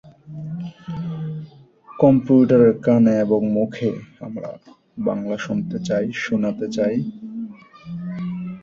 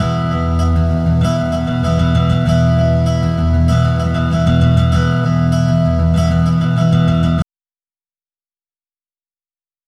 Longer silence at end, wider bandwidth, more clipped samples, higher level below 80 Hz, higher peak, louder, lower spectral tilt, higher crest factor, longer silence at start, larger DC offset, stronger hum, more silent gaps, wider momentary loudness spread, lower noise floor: second, 0 s vs 2.45 s; second, 7.6 kHz vs 10.5 kHz; neither; second, -56 dBFS vs -24 dBFS; about the same, -2 dBFS vs 0 dBFS; second, -20 LUFS vs -14 LUFS; about the same, -8 dB/octave vs -8 dB/octave; about the same, 18 dB vs 14 dB; about the same, 0.05 s vs 0 s; neither; neither; neither; first, 19 LU vs 4 LU; second, -46 dBFS vs under -90 dBFS